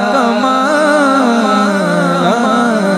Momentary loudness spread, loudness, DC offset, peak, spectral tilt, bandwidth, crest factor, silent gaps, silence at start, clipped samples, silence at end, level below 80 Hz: 2 LU; -11 LUFS; under 0.1%; 0 dBFS; -5 dB/octave; 14.5 kHz; 12 dB; none; 0 s; under 0.1%; 0 s; -56 dBFS